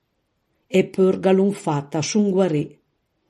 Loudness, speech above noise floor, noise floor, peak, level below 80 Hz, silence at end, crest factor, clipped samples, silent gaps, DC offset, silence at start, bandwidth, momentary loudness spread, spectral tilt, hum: -20 LUFS; 52 dB; -71 dBFS; -4 dBFS; -66 dBFS; 0.6 s; 16 dB; under 0.1%; none; under 0.1%; 0.7 s; 12 kHz; 7 LU; -6 dB/octave; none